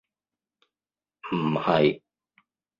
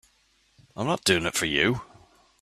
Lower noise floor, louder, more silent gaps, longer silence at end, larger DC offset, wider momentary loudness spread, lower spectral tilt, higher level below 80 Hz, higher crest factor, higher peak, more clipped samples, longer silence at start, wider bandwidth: first, under -90 dBFS vs -65 dBFS; about the same, -24 LUFS vs -25 LUFS; neither; first, 0.8 s vs 0.55 s; neither; first, 18 LU vs 11 LU; first, -8.5 dB/octave vs -3.5 dB/octave; second, -64 dBFS vs -54 dBFS; about the same, 22 dB vs 22 dB; about the same, -6 dBFS vs -6 dBFS; neither; first, 1.25 s vs 0.75 s; second, 7.2 kHz vs 15 kHz